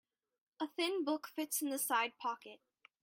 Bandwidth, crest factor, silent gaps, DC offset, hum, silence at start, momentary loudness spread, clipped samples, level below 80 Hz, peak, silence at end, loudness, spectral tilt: 16.5 kHz; 18 dB; none; under 0.1%; none; 0.6 s; 10 LU; under 0.1%; under -90 dBFS; -22 dBFS; 0.45 s; -38 LUFS; -0.5 dB/octave